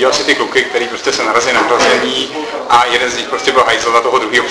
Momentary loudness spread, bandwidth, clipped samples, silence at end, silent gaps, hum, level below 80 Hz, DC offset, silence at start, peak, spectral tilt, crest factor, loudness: 5 LU; 11 kHz; under 0.1%; 0 s; none; none; -48 dBFS; under 0.1%; 0 s; 0 dBFS; -1.5 dB/octave; 12 dB; -12 LUFS